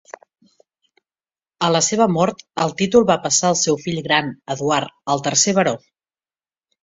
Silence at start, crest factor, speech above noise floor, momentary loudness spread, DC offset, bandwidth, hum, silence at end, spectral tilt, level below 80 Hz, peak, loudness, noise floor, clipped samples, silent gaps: 1.6 s; 18 dB; over 72 dB; 8 LU; under 0.1%; 7.8 kHz; none; 1.05 s; -3.5 dB/octave; -58 dBFS; -2 dBFS; -18 LUFS; under -90 dBFS; under 0.1%; none